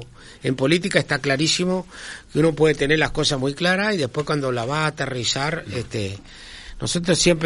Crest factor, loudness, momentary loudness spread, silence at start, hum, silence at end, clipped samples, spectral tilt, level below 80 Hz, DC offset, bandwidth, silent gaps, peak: 20 dB; -21 LUFS; 13 LU; 0 s; none; 0 s; under 0.1%; -4 dB/octave; -44 dBFS; under 0.1%; 11.5 kHz; none; 0 dBFS